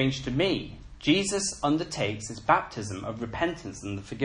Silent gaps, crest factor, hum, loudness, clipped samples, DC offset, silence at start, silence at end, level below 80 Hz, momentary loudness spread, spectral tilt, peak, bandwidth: none; 22 dB; none; -28 LUFS; under 0.1%; under 0.1%; 0 s; 0 s; -50 dBFS; 12 LU; -4 dB/octave; -8 dBFS; 10.5 kHz